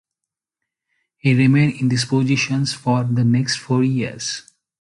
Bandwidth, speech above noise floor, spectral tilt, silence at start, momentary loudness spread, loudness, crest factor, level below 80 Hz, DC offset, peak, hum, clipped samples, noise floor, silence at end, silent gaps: 11.5 kHz; 67 dB; -5.5 dB/octave; 1.25 s; 9 LU; -18 LUFS; 14 dB; -56 dBFS; under 0.1%; -4 dBFS; none; under 0.1%; -84 dBFS; 0.4 s; none